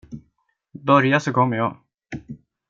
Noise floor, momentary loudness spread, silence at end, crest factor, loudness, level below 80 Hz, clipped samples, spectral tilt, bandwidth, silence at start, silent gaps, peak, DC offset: -69 dBFS; 25 LU; 0.35 s; 20 dB; -19 LUFS; -58 dBFS; under 0.1%; -6.5 dB/octave; 7.8 kHz; 0.1 s; none; -2 dBFS; under 0.1%